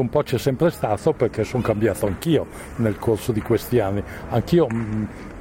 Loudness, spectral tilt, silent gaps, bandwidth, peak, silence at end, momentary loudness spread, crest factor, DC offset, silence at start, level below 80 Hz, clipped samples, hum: -22 LUFS; -7 dB/octave; none; 16.5 kHz; -6 dBFS; 0 s; 6 LU; 14 dB; under 0.1%; 0 s; -42 dBFS; under 0.1%; none